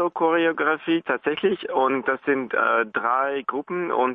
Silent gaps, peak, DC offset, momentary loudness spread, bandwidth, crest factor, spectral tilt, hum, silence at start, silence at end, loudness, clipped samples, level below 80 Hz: none; -10 dBFS; under 0.1%; 5 LU; 4 kHz; 14 dB; -8.5 dB/octave; none; 0 s; 0 s; -23 LUFS; under 0.1%; -68 dBFS